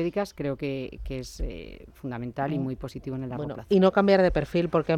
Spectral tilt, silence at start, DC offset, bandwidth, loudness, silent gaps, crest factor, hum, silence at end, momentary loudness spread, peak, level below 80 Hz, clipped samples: -7.5 dB/octave; 0 s; under 0.1%; 14 kHz; -27 LUFS; none; 18 dB; none; 0 s; 16 LU; -8 dBFS; -42 dBFS; under 0.1%